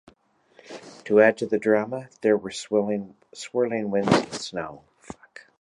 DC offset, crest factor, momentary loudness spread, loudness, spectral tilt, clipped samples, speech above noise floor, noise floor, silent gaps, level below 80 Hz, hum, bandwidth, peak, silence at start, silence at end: under 0.1%; 22 dB; 24 LU; -24 LUFS; -5 dB/octave; under 0.1%; 38 dB; -61 dBFS; none; -60 dBFS; none; 11 kHz; -4 dBFS; 0.7 s; 0.2 s